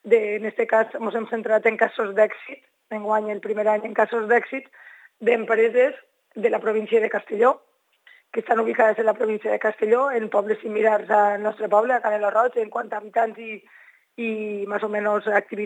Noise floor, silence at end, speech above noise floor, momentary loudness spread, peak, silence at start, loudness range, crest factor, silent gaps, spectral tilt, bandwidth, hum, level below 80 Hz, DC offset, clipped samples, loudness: -56 dBFS; 0 s; 34 dB; 11 LU; -4 dBFS; 0.05 s; 3 LU; 18 dB; none; -6 dB/octave; 9 kHz; none; -90 dBFS; under 0.1%; under 0.1%; -22 LUFS